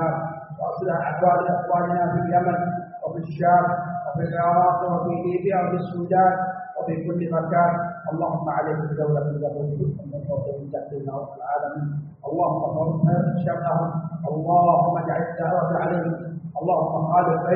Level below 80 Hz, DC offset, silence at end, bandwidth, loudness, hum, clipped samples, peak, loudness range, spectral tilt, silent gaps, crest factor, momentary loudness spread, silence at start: -60 dBFS; under 0.1%; 0 s; 3.8 kHz; -23 LUFS; none; under 0.1%; -6 dBFS; 5 LU; -4.5 dB/octave; none; 16 dB; 11 LU; 0 s